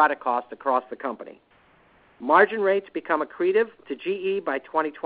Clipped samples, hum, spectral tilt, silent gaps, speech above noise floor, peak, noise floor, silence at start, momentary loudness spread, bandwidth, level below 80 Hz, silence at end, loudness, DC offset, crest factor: under 0.1%; none; -9 dB/octave; none; 34 dB; -4 dBFS; -58 dBFS; 0 s; 14 LU; 4.8 kHz; -72 dBFS; 0.05 s; -24 LUFS; under 0.1%; 22 dB